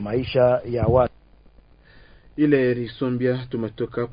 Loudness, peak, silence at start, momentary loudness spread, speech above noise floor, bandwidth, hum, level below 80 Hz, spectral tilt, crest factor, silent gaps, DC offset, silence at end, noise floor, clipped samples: -22 LUFS; -6 dBFS; 0 s; 9 LU; 30 dB; 5.2 kHz; none; -42 dBFS; -12 dB/octave; 18 dB; none; under 0.1%; 0 s; -51 dBFS; under 0.1%